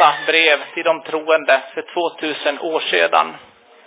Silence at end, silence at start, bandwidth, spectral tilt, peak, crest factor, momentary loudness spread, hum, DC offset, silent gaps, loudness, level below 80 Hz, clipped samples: 0.45 s; 0 s; 4 kHz; -6 dB/octave; 0 dBFS; 18 dB; 9 LU; none; under 0.1%; none; -17 LUFS; -78 dBFS; under 0.1%